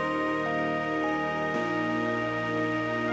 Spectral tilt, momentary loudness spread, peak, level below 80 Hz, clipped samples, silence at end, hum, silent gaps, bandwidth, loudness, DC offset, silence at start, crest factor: -6 dB/octave; 1 LU; -18 dBFS; -58 dBFS; under 0.1%; 0 s; none; none; 8 kHz; -28 LUFS; under 0.1%; 0 s; 12 dB